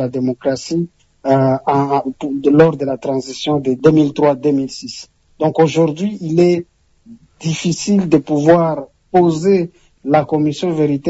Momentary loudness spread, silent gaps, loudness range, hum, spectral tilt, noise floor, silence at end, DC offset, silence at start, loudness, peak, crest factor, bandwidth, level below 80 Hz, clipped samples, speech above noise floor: 10 LU; none; 2 LU; none; -6.5 dB/octave; -43 dBFS; 0 s; under 0.1%; 0 s; -15 LUFS; 0 dBFS; 14 dB; 8 kHz; -52 dBFS; under 0.1%; 29 dB